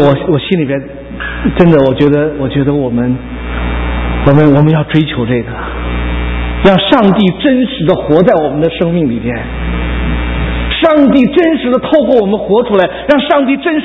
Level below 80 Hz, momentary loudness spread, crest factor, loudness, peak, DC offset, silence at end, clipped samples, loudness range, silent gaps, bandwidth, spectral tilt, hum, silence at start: -22 dBFS; 10 LU; 10 dB; -11 LUFS; 0 dBFS; under 0.1%; 0 s; 0.7%; 2 LU; none; 6 kHz; -9 dB/octave; none; 0 s